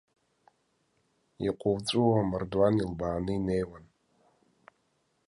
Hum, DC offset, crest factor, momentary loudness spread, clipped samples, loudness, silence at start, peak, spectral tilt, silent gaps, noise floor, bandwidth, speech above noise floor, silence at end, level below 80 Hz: none; under 0.1%; 18 dB; 8 LU; under 0.1%; -29 LUFS; 1.4 s; -12 dBFS; -7 dB/octave; none; -74 dBFS; 11.5 kHz; 46 dB; 1.45 s; -54 dBFS